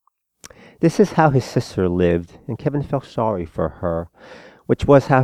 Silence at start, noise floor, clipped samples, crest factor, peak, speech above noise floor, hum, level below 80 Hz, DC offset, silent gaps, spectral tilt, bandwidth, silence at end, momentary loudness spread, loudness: 0.8 s; -48 dBFS; under 0.1%; 20 dB; 0 dBFS; 29 dB; none; -42 dBFS; under 0.1%; none; -7.5 dB/octave; 14 kHz; 0 s; 11 LU; -19 LUFS